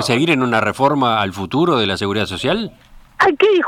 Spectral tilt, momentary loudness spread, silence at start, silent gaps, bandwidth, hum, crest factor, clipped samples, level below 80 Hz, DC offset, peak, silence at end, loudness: -5 dB/octave; 6 LU; 0 s; none; 15.5 kHz; none; 16 dB; under 0.1%; -50 dBFS; under 0.1%; 0 dBFS; 0 s; -16 LUFS